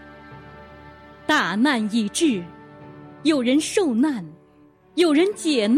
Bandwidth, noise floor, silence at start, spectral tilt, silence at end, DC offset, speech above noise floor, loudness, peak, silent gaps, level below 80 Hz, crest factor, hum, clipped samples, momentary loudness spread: 15.5 kHz; -53 dBFS; 0 s; -4 dB/octave; 0 s; under 0.1%; 34 dB; -21 LUFS; -6 dBFS; none; -60 dBFS; 16 dB; none; under 0.1%; 24 LU